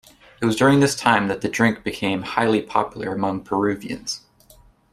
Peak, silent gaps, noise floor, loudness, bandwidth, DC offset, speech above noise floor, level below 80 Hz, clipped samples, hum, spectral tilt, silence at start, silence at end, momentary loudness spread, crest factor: -2 dBFS; none; -52 dBFS; -21 LUFS; 14.5 kHz; under 0.1%; 32 dB; -54 dBFS; under 0.1%; none; -5 dB/octave; 0.4 s; 0.75 s; 12 LU; 20 dB